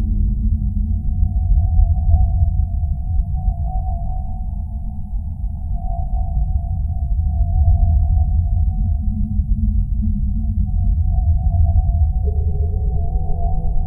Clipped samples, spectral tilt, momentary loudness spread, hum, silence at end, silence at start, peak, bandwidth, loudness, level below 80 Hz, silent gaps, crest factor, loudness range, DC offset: under 0.1%; -15 dB/octave; 9 LU; none; 0 s; 0 s; -2 dBFS; 0.9 kHz; -20 LUFS; -18 dBFS; none; 14 dB; 6 LU; 0.3%